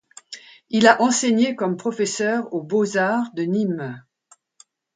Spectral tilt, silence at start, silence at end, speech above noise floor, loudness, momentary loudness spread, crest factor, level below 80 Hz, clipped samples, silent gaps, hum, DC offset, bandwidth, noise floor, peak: -4 dB/octave; 0.3 s; 0.95 s; 38 dB; -20 LUFS; 23 LU; 22 dB; -68 dBFS; under 0.1%; none; none; under 0.1%; 9.6 kHz; -58 dBFS; 0 dBFS